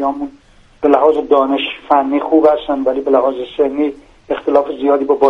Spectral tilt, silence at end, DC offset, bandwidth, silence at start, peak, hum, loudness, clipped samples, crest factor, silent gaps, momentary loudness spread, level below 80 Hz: -6 dB/octave; 0 s; under 0.1%; 6.2 kHz; 0 s; 0 dBFS; none; -14 LUFS; under 0.1%; 14 dB; none; 9 LU; -48 dBFS